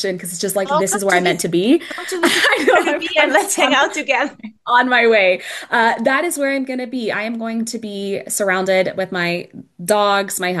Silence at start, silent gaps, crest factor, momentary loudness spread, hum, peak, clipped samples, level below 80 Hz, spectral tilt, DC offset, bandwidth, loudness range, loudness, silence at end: 0 s; none; 16 dB; 10 LU; none; -2 dBFS; under 0.1%; -66 dBFS; -3 dB/octave; under 0.1%; 13 kHz; 5 LU; -16 LUFS; 0 s